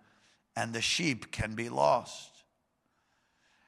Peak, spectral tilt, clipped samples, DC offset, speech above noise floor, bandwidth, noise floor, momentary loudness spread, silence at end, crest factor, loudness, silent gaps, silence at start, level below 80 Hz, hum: -12 dBFS; -3.5 dB/octave; under 0.1%; under 0.1%; 46 dB; 15 kHz; -77 dBFS; 15 LU; 1.4 s; 22 dB; -31 LUFS; none; 0.55 s; -58 dBFS; none